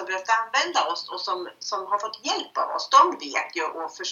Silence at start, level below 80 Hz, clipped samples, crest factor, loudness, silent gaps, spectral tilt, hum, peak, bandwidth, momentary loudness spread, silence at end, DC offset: 0 s; -88 dBFS; under 0.1%; 22 dB; -24 LUFS; none; 0.5 dB/octave; none; -4 dBFS; 7.6 kHz; 12 LU; 0 s; under 0.1%